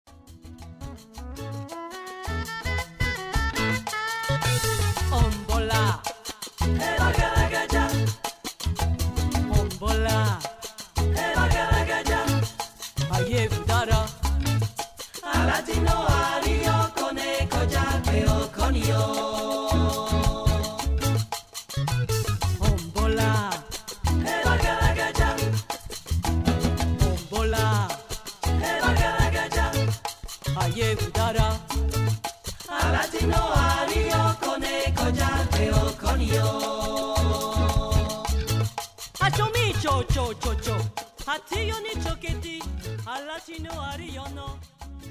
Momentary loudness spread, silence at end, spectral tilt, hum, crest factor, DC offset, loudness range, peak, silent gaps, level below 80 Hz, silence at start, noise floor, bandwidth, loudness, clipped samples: 11 LU; 0 s; -5 dB/octave; none; 14 dB; under 0.1%; 4 LU; -10 dBFS; none; -30 dBFS; 0.3 s; -45 dBFS; 16 kHz; -25 LUFS; under 0.1%